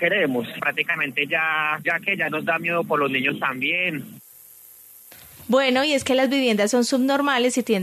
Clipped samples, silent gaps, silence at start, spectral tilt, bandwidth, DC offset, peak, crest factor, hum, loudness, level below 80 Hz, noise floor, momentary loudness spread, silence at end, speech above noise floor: under 0.1%; none; 0 s; -3.5 dB/octave; 14 kHz; under 0.1%; -6 dBFS; 16 dB; none; -21 LUFS; -68 dBFS; -47 dBFS; 5 LU; 0 s; 25 dB